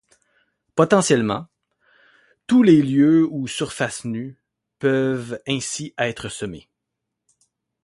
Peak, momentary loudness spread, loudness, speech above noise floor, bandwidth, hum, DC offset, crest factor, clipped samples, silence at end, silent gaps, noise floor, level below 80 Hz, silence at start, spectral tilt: -2 dBFS; 16 LU; -20 LUFS; 62 dB; 11.5 kHz; none; under 0.1%; 20 dB; under 0.1%; 1.25 s; none; -81 dBFS; -58 dBFS; 0.75 s; -5.5 dB/octave